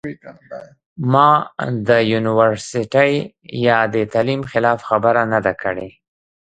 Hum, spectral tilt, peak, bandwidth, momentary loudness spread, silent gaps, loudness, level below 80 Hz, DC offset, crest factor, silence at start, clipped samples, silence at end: none; -6 dB/octave; 0 dBFS; 9.2 kHz; 19 LU; 0.86-0.96 s; -17 LUFS; -54 dBFS; under 0.1%; 18 dB; 0.05 s; under 0.1%; 0.7 s